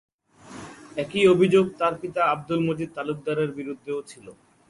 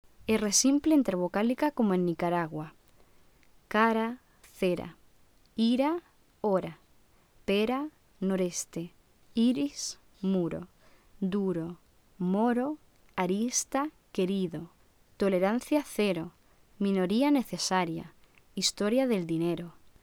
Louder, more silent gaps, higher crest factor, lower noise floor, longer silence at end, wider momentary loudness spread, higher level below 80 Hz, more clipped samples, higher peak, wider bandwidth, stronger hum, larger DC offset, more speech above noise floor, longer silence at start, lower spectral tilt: first, -24 LUFS vs -29 LUFS; neither; about the same, 18 dB vs 20 dB; second, -46 dBFS vs -62 dBFS; about the same, 0.4 s vs 0.3 s; first, 23 LU vs 15 LU; about the same, -62 dBFS vs -62 dBFS; neither; first, -6 dBFS vs -12 dBFS; second, 11.5 kHz vs 18.5 kHz; neither; neither; second, 22 dB vs 34 dB; first, 0.5 s vs 0.2 s; first, -6.5 dB/octave vs -4.5 dB/octave